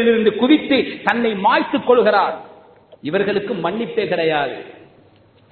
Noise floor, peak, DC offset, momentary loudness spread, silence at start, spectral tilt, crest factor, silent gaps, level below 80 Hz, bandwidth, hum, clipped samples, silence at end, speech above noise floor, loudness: -51 dBFS; 0 dBFS; under 0.1%; 9 LU; 0 s; -7.5 dB/octave; 18 dB; none; -60 dBFS; 4.5 kHz; none; under 0.1%; 0.8 s; 34 dB; -17 LUFS